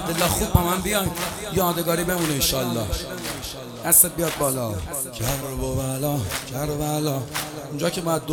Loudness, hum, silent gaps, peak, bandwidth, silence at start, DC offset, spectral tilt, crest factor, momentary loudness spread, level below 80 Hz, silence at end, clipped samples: -23 LUFS; none; none; 0 dBFS; 19.5 kHz; 0 s; under 0.1%; -3.5 dB/octave; 24 dB; 10 LU; -38 dBFS; 0 s; under 0.1%